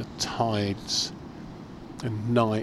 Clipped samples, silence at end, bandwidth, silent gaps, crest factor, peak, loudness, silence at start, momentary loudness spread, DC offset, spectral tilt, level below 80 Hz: under 0.1%; 0 s; 13.5 kHz; none; 20 dB; -8 dBFS; -28 LUFS; 0 s; 17 LU; under 0.1%; -4.5 dB/octave; -52 dBFS